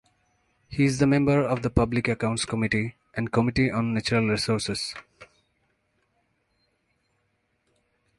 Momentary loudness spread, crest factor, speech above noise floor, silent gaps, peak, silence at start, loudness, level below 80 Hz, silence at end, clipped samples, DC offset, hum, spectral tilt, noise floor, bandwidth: 10 LU; 22 dB; 49 dB; none; -4 dBFS; 0.7 s; -25 LUFS; -46 dBFS; 2.95 s; under 0.1%; under 0.1%; none; -5.5 dB/octave; -73 dBFS; 11.5 kHz